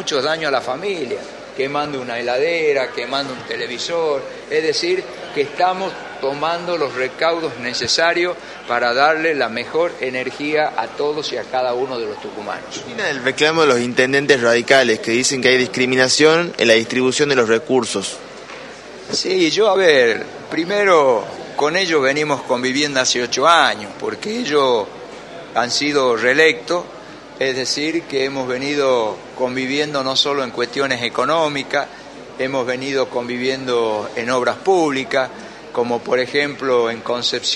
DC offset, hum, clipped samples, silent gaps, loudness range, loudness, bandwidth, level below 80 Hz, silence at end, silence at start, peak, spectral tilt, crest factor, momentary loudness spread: under 0.1%; none; under 0.1%; none; 6 LU; -18 LUFS; 11.5 kHz; -58 dBFS; 0 s; 0 s; 0 dBFS; -3 dB/octave; 18 dB; 12 LU